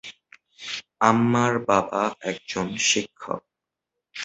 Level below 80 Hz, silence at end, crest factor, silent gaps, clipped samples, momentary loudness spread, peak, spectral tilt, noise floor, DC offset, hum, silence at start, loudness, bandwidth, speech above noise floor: -60 dBFS; 0 s; 24 dB; none; under 0.1%; 14 LU; -2 dBFS; -3.5 dB/octave; -84 dBFS; under 0.1%; none; 0.05 s; -23 LUFS; 8.2 kHz; 62 dB